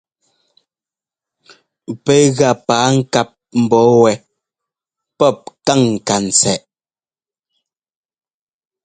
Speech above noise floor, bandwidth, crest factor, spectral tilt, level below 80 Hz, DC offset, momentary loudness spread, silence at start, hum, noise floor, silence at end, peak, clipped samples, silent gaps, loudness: over 77 dB; 9.6 kHz; 16 dB; -4.5 dB/octave; -56 dBFS; under 0.1%; 10 LU; 1.9 s; none; under -90 dBFS; 2.25 s; 0 dBFS; under 0.1%; none; -14 LUFS